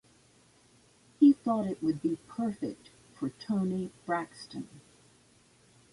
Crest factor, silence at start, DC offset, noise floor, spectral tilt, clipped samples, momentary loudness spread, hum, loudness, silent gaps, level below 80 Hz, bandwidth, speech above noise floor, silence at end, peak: 20 dB; 1.2 s; under 0.1%; -63 dBFS; -7.5 dB/octave; under 0.1%; 19 LU; none; -31 LUFS; none; -70 dBFS; 11.5 kHz; 30 dB; 1.15 s; -12 dBFS